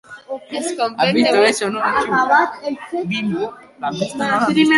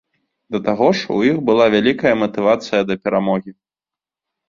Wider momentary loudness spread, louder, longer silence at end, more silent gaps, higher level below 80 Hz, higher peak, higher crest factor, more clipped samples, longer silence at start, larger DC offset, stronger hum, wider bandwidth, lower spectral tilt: first, 13 LU vs 7 LU; about the same, -18 LUFS vs -17 LUFS; second, 0 s vs 0.95 s; neither; about the same, -58 dBFS vs -56 dBFS; about the same, -2 dBFS vs -2 dBFS; about the same, 16 dB vs 16 dB; neither; second, 0.1 s vs 0.5 s; neither; neither; first, 11.5 kHz vs 7.4 kHz; second, -4 dB/octave vs -6 dB/octave